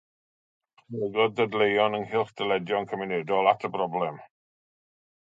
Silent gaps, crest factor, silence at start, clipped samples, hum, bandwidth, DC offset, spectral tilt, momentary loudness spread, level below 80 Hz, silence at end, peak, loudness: none; 22 dB; 0.9 s; under 0.1%; none; 7.6 kHz; under 0.1%; -6.5 dB/octave; 9 LU; -72 dBFS; 0.95 s; -6 dBFS; -26 LUFS